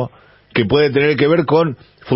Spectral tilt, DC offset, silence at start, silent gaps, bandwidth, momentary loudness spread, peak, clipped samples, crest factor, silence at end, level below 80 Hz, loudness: -5 dB/octave; under 0.1%; 0 s; none; 5.8 kHz; 11 LU; -2 dBFS; under 0.1%; 14 dB; 0 s; -48 dBFS; -15 LUFS